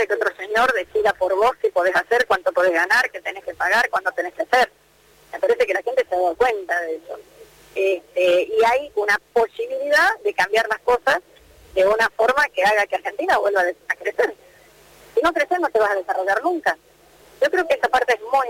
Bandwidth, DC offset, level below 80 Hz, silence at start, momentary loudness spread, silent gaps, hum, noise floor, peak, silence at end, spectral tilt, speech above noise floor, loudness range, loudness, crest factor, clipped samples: 17 kHz; under 0.1%; -56 dBFS; 0 s; 7 LU; none; none; -54 dBFS; -8 dBFS; 0 s; -2.5 dB/octave; 34 dB; 3 LU; -20 LUFS; 12 dB; under 0.1%